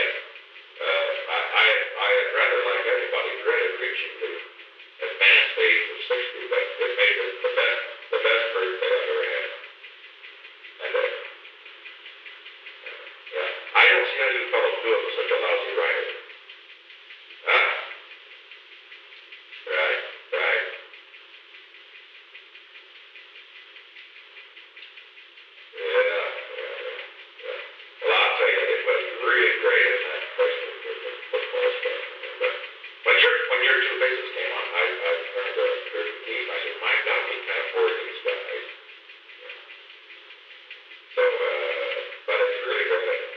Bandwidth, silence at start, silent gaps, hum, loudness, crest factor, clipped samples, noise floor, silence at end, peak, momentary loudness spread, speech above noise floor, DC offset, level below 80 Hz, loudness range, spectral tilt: 6.2 kHz; 0 s; none; none; -23 LUFS; 22 dB; under 0.1%; -48 dBFS; 0 s; -4 dBFS; 25 LU; 25 dB; under 0.1%; under -90 dBFS; 11 LU; -1 dB/octave